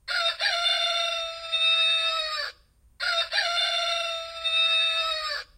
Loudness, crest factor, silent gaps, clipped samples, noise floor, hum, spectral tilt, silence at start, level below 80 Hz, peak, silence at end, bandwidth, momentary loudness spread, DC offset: -23 LUFS; 14 dB; none; under 0.1%; -55 dBFS; none; 2.5 dB/octave; 0.05 s; -62 dBFS; -12 dBFS; 0.15 s; 16 kHz; 9 LU; under 0.1%